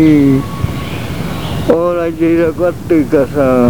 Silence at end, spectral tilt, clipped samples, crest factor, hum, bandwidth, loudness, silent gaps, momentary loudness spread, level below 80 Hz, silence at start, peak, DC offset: 0 s; -7.5 dB/octave; 0.1%; 12 dB; none; over 20 kHz; -13 LUFS; none; 10 LU; -32 dBFS; 0 s; 0 dBFS; 3%